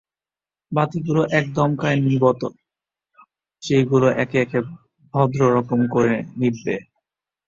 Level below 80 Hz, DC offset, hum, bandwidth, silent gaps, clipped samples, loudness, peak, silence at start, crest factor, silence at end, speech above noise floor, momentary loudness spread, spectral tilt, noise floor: -56 dBFS; under 0.1%; none; 7.6 kHz; none; under 0.1%; -20 LUFS; -4 dBFS; 0.7 s; 18 dB; 0.65 s; over 71 dB; 10 LU; -7.5 dB/octave; under -90 dBFS